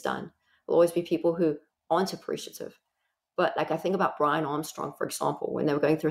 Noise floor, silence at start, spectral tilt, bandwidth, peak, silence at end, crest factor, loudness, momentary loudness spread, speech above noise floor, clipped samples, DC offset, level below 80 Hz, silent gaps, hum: -81 dBFS; 0.05 s; -5.5 dB/octave; 16 kHz; -12 dBFS; 0 s; 16 dB; -28 LUFS; 14 LU; 53 dB; under 0.1%; under 0.1%; -70 dBFS; none; none